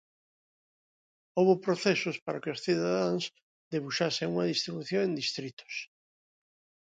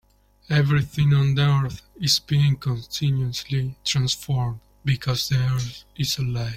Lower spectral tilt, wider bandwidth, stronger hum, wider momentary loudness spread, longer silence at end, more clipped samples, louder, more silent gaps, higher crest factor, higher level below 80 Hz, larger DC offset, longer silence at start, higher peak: about the same, -5 dB/octave vs -5 dB/octave; second, 9.2 kHz vs 16 kHz; neither; first, 13 LU vs 8 LU; first, 1 s vs 0 s; neither; second, -31 LUFS vs -23 LUFS; first, 2.22-2.26 s, 3.42-3.71 s, 5.53-5.57 s vs none; about the same, 20 dB vs 16 dB; second, -76 dBFS vs -46 dBFS; neither; first, 1.35 s vs 0.5 s; second, -12 dBFS vs -6 dBFS